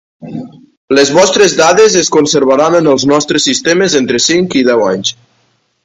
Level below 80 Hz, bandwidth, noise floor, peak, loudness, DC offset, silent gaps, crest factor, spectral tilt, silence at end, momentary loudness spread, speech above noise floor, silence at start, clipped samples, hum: -50 dBFS; 10 kHz; -57 dBFS; 0 dBFS; -9 LUFS; under 0.1%; 0.77-0.88 s; 10 dB; -3 dB/octave; 0.75 s; 9 LU; 48 dB; 0.2 s; 0.3%; none